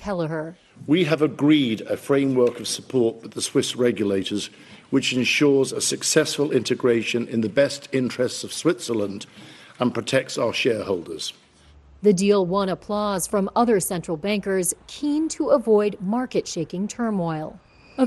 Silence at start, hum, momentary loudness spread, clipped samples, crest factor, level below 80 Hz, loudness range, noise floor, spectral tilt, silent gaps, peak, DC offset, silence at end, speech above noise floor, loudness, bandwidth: 0 s; none; 10 LU; under 0.1%; 18 dB; -58 dBFS; 3 LU; -52 dBFS; -4.5 dB/octave; none; -4 dBFS; under 0.1%; 0 s; 30 dB; -22 LUFS; 12.5 kHz